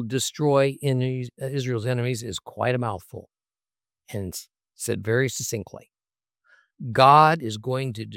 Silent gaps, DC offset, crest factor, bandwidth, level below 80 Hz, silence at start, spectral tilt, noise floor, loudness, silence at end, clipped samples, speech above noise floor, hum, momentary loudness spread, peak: none; under 0.1%; 22 dB; 16.5 kHz; -64 dBFS; 0 s; -5 dB/octave; under -90 dBFS; -23 LUFS; 0 s; under 0.1%; over 67 dB; none; 20 LU; -2 dBFS